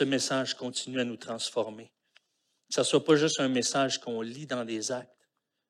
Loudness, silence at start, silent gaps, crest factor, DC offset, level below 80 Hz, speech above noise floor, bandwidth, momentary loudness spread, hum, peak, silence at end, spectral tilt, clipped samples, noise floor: -29 LUFS; 0 s; none; 22 dB; under 0.1%; -84 dBFS; 48 dB; 13.5 kHz; 12 LU; none; -10 dBFS; 0.65 s; -3.5 dB/octave; under 0.1%; -77 dBFS